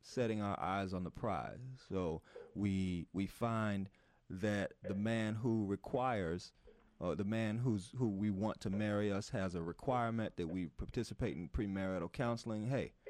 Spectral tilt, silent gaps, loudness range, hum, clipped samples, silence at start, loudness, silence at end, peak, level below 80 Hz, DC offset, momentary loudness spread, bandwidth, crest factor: -7 dB/octave; none; 2 LU; none; under 0.1%; 0.05 s; -40 LUFS; 0 s; -24 dBFS; -58 dBFS; under 0.1%; 6 LU; 13 kHz; 16 dB